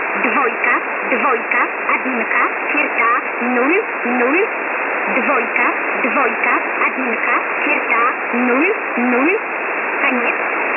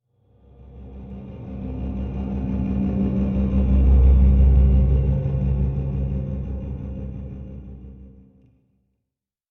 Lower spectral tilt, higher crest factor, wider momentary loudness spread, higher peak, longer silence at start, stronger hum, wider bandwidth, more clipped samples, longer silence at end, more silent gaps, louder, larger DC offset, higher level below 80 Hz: second, -7 dB/octave vs -12 dB/octave; about the same, 16 dB vs 16 dB; second, 3 LU vs 22 LU; first, 0 dBFS vs -6 dBFS; second, 0 s vs 0.7 s; neither; first, 3.8 kHz vs 3 kHz; neither; second, 0 s vs 1.45 s; neither; first, -16 LUFS vs -21 LUFS; neither; second, -70 dBFS vs -22 dBFS